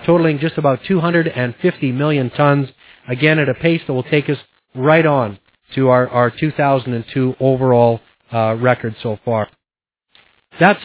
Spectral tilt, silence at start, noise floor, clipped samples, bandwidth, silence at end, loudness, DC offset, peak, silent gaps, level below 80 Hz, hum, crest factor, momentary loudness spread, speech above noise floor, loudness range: -11 dB/octave; 0 s; -86 dBFS; under 0.1%; 4 kHz; 0 s; -16 LUFS; under 0.1%; 0 dBFS; none; -52 dBFS; none; 16 dB; 10 LU; 70 dB; 2 LU